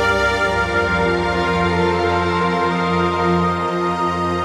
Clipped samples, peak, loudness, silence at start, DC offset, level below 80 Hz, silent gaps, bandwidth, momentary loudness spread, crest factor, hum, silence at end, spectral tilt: under 0.1%; -4 dBFS; -18 LUFS; 0 s; under 0.1%; -36 dBFS; none; 12.5 kHz; 2 LU; 12 dB; none; 0 s; -6 dB/octave